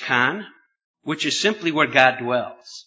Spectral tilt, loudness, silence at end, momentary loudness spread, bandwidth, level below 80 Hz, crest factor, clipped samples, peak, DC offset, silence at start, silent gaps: -3.5 dB/octave; -20 LUFS; 0.05 s; 17 LU; 8 kHz; -70 dBFS; 22 dB; under 0.1%; 0 dBFS; under 0.1%; 0 s; 0.84-0.94 s